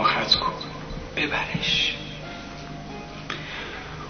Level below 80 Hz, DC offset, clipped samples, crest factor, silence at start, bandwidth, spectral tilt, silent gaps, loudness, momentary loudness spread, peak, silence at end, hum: -44 dBFS; 0.1%; under 0.1%; 24 dB; 0 s; 6.6 kHz; -3.5 dB/octave; none; -25 LUFS; 16 LU; -4 dBFS; 0 s; 50 Hz at -45 dBFS